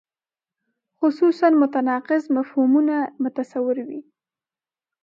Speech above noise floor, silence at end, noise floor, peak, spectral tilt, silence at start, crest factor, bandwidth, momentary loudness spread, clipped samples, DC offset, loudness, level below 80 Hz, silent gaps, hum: over 70 dB; 1 s; under -90 dBFS; -4 dBFS; -6.5 dB/octave; 1 s; 18 dB; 7.2 kHz; 9 LU; under 0.1%; under 0.1%; -21 LUFS; -82 dBFS; none; none